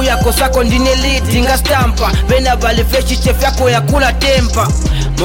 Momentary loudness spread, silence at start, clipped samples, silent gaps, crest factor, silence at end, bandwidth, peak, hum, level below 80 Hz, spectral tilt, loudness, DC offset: 2 LU; 0 s; under 0.1%; none; 10 dB; 0 s; 17 kHz; -2 dBFS; none; -16 dBFS; -4.5 dB/octave; -12 LUFS; under 0.1%